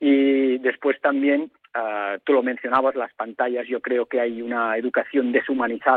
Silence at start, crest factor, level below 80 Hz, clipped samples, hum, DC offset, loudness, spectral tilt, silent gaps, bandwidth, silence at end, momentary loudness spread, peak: 0 s; 16 dB; -68 dBFS; under 0.1%; none; under 0.1%; -22 LUFS; -7.5 dB/octave; none; 4.2 kHz; 0 s; 7 LU; -6 dBFS